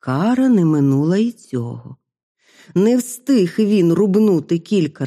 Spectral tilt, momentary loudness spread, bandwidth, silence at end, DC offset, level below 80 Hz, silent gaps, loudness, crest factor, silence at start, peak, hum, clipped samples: -7.5 dB/octave; 11 LU; 14.5 kHz; 0 s; under 0.1%; -64 dBFS; 2.23-2.35 s; -16 LUFS; 12 dB; 0.05 s; -4 dBFS; none; under 0.1%